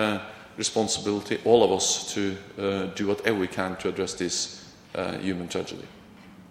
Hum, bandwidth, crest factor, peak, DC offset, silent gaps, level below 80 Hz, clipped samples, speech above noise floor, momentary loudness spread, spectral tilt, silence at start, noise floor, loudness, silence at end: none; 15.5 kHz; 24 dB; -4 dBFS; under 0.1%; none; -62 dBFS; under 0.1%; 22 dB; 13 LU; -3.5 dB/octave; 0 s; -48 dBFS; -26 LUFS; 0.05 s